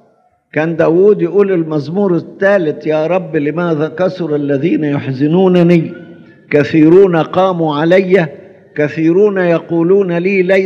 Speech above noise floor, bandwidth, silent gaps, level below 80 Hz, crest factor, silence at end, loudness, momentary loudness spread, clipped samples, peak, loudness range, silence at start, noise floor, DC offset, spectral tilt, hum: 42 dB; 6.8 kHz; none; -62 dBFS; 12 dB; 0 s; -12 LUFS; 8 LU; 0.1%; 0 dBFS; 3 LU; 0.55 s; -53 dBFS; under 0.1%; -8.5 dB/octave; none